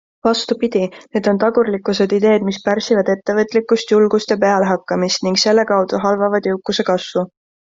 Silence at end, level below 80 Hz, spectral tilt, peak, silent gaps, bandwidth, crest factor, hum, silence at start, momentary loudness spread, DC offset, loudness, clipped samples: 0.5 s; -58 dBFS; -4.5 dB/octave; -2 dBFS; none; 7.8 kHz; 14 dB; none; 0.25 s; 5 LU; under 0.1%; -16 LUFS; under 0.1%